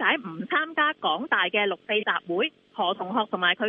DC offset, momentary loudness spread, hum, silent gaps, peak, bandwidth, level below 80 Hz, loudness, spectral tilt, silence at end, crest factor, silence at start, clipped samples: under 0.1%; 5 LU; none; none; -8 dBFS; 4.7 kHz; -80 dBFS; -25 LUFS; -7 dB/octave; 0 s; 18 dB; 0 s; under 0.1%